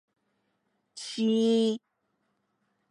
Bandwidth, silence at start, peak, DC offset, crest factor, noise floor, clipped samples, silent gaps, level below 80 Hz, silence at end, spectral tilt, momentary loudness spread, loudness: 11 kHz; 0.95 s; -16 dBFS; under 0.1%; 14 dB; -77 dBFS; under 0.1%; none; -88 dBFS; 1.15 s; -5.5 dB/octave; 14 LU; -26 LUFS